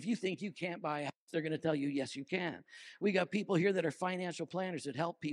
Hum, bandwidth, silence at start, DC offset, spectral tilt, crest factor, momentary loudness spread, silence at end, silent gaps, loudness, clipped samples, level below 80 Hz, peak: none; 11.5 kHz; 0 s; under 0.1%; -6 dB/octave; 18 dB; 8 LU; 0 s; 1.16-1.27 s; -37 LUFS; under 0.1%; -86 dBFS; -18 dBFS